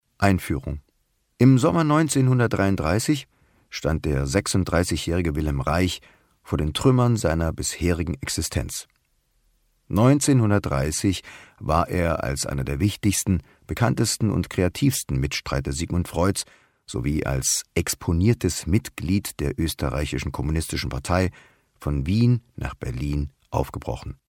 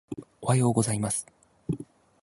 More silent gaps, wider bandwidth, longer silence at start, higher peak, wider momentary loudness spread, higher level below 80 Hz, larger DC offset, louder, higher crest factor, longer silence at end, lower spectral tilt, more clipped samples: neither; first, 17.5 kHz vs 11.5 kHz; about the same, 0.2 s vs 0.1 s; first, -4 dBFS vs -8 dBFS; second, 10 LU vs 19 LU; first, -36 dBFS vs -58 dBFS; neither; first, -23 LUFS vs -28 LUFS; about the same, 20 dB vs 20 dB; second, 0.15 s vs 0.4 s; about the same, -5.5 dB/octave vs -5.5 dB/octave; neither